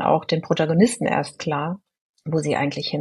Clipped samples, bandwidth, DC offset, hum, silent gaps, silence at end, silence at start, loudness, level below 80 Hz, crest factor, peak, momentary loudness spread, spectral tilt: under 0.1%; 12 kHz; under 0.1%; none; 2.01-2.14 s; 0 s; 0 s; -22 LUFS; -60 dBFS; 18 dB; -4 dBFS; 10 LU; -5.5 dB/octave